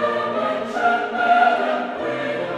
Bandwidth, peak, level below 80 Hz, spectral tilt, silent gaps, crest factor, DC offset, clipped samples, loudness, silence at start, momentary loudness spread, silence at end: 9.8 kHz; -4 dBFS; -66 dBFS; -5 dB/octave; none; 16 dB; under 0.1%; under 0.1%; -20 LUFS; 0 s; 8 LU; 0 s